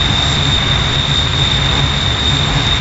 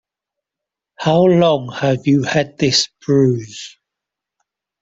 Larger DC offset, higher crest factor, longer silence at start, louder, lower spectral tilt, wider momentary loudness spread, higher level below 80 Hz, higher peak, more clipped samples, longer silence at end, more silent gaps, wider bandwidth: neither; about the same, 12 dB vs 16 dB; second, 0 s vs 1 s; first, -12 LUFS vs -15 LUFS; second, -3.5 dB/octave vs -5.5 dB/octave; second, 1 LU vs 12 LU; first, -22 dBFS vs -54 dBFS; about the same, -2 dBFS vs -2 dBFS; neither; second, 0 s vs 1.15 s; neither; about the same, 8 kHz vs 8 kHz